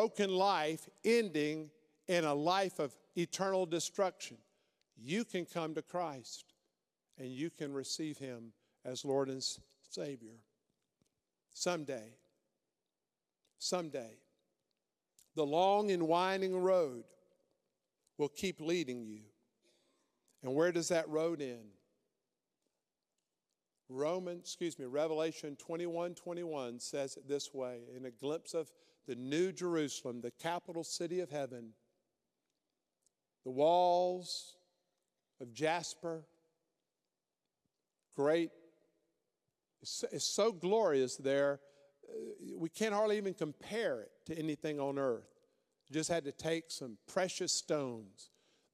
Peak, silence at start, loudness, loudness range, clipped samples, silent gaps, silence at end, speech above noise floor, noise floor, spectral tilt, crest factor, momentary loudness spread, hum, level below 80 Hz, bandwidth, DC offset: -18 dBFS; 0 s; -37 LUFS; 9 LU; under 0.1%; none; 0.5 s; over 53 dB; under -90 dBFS; -4 dB/octave; 20 dB; 16 LU; none; -84 dBFS; 15.5 kHz; under 0.1%